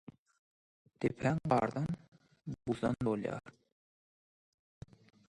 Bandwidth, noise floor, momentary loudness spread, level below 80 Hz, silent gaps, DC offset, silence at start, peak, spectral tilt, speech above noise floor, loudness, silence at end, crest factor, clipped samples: 11 kHz; under -90 dBFS; 20 LU; -64 dBFS; 2.08-2.12 s; under 0.1%; 1 s; -14 dBFS; -8 dB/octave; over 55 dB; -36 LUFS; 1.8 s; 24 dB; under 0.1%